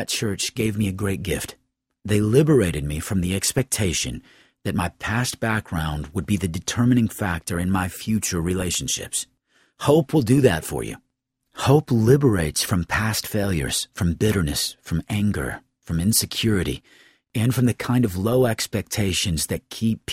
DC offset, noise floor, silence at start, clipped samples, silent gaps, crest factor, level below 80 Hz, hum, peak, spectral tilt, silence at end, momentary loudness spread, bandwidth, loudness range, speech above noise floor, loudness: under 0.1%; -74 dBFS; 0 s; under 0.1%; none; 20 dB; -42 dBFS; none; -2 dBFS; -5 dB/octave; 0 s; 11 LU; 16.5 kHz; 3 LU; 52 dB; -22 LUFS